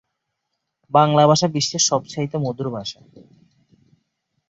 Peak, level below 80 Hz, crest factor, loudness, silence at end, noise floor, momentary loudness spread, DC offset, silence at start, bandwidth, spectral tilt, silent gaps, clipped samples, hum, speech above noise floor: -2 dBFS; -62 dBFS; 20 dB; -19 LUFS; 1.6 s; -77 dBFS; 13 LU; under 0.1%; 0.95 s; 8 kHz; -4.5 dB/octave; none; under 0.1%; none; 58 dB